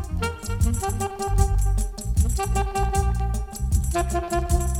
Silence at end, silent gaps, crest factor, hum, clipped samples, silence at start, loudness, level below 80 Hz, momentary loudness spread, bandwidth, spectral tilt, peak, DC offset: 0 s; none; 16 dB; none; under 0.1%; 0 s; -25 LUFS; -24 dBFS; 5 LU; 16.5 kHz; -5.5 dB/octave; -6 dBFS; under 0.1%